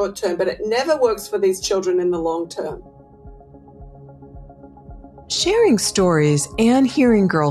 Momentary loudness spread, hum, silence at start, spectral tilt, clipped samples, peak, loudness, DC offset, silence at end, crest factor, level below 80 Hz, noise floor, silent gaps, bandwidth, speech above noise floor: 9 LU; none; 0 s; -5 dB/octave; under 0.1%; -6 dBFS; -18 LUFS; under 0.1%; 0 s; 14 dB; -44 dBFS; -43 dBFS; none; 13 kHz; 25 dB